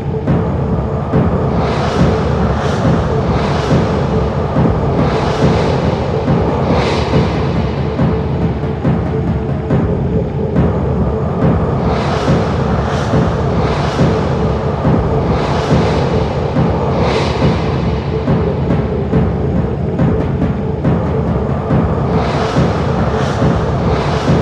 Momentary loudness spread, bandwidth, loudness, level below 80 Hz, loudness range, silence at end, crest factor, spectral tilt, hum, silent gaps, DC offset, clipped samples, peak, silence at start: 3 LU; 9.2 kHz; -15 LUFS; -24 dBFS; 1 LU; 0 s; 14 dB; -8 dB/octave; none; none; under 0.1%; under 0.1%; 0 dBFS; 0 s